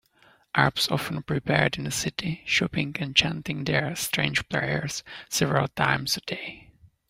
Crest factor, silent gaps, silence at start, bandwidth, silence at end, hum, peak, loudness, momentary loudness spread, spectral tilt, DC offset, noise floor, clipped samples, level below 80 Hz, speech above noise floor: 24 dB; none; 0.55 s; 16 kHz; 0.25 s; none; -4 dBFS; -26 LUFS; 8 LU; -3.5 dB/octave; under 0.1%; -60 dBFS; under 0.1%; -54 dBFS; 34 dB